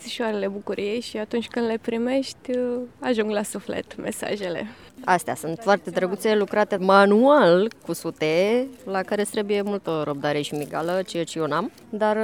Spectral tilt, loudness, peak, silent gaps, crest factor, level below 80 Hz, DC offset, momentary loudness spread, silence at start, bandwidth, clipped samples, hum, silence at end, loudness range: -5 dB/octave; -23 LUFS; -2 dBFS; none; 22 dB; -64 dBFS; under 0.1%; 13 LU; 0 s; 17.5 kHz; under 0.1%; none; 0 s; 7 LU